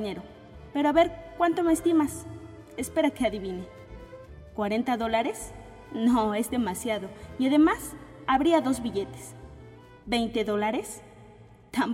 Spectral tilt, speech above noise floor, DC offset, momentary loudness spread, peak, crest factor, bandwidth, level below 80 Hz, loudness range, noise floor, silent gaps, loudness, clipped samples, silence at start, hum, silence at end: -5 dB/octave; 25 dB; under 0.1%; 22 LU; -10 dBFS; 18 dB; 16 kHz; -52 dBFS; 4 LU; -51 dBFS; none; -27 LUFS; under 0.1%; 0 s; none; 0 s